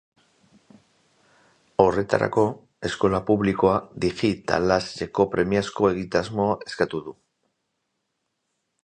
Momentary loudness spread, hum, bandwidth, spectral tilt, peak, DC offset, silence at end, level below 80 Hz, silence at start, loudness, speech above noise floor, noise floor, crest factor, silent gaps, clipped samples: 8 LU; none; 9.8 kHz; -6 dB/octave; -2 dBFS; under 0.1%; 1.7 s; -50 dBFS; 1.8 s; -23 LUFS; 55 dB; -77 dBFS; 24 dB; none; under 0.1%